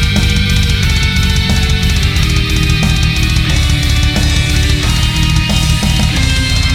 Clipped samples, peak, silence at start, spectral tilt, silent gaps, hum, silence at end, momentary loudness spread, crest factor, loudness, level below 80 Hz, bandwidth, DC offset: under 0.1%; 0 dBFS; 0 s; -4 dB/octave; none; none; 0 s; 1 LU; 10 dB; -12 LUFS; -14 dBFS; 16.5 kHz; under 0.1%